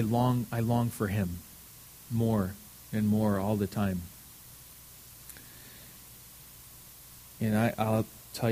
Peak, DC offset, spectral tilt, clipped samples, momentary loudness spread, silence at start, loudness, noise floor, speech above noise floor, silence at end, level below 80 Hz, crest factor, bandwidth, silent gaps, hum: -14 dBFS; under 0.1%; -7 dB/octave; under 0.1%; 20 LU; 0 s; -30 LUFS; -51 dBFS; 22 dB; 0 s; -56 dBFS; 18 dB; 15.5 kHz; none; 60 Hz at -60 dBFS